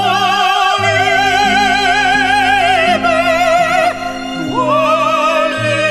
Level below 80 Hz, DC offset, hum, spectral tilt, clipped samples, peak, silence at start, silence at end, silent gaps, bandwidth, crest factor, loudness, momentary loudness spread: -40 dBFS; under 0.1%; none; -3.5 dB/octave; under 0.1%; 0 dBFS; 0 s; 0 s; none; 15 kHz; 12 dB; -12 LUFS; 4 LU